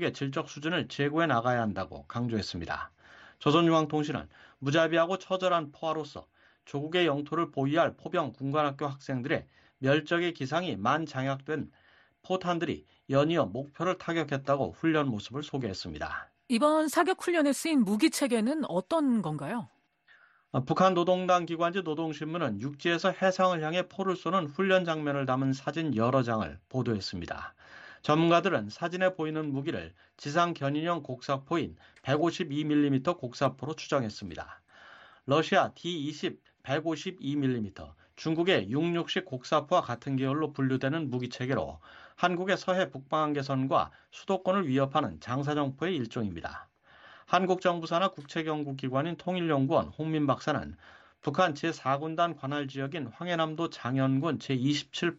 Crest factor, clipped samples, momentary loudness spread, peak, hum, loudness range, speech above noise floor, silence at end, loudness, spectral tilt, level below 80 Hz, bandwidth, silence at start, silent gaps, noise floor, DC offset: 20 dB; under 0.1%; 11 LU; -10 dBFS; none; 3 LU; 33 dB; 0 s; -30 LUFS; -6 dB/octave; -64 dBFS; 10.5 kHz; 0 s; none; -63 dBFS; under 0.1%